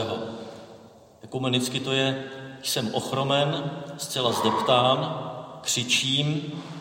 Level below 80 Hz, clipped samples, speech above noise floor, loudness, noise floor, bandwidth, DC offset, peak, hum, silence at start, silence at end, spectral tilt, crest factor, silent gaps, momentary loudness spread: -68 dBFS; under 0.1%; 24 dB; -25 LUFS; -50 dBFS; 16.5 kHz; under 0.1%; -8 dBFS; none; 0 s; 0 s; -3.5 dB/octave; 20 dB; none; 15 LU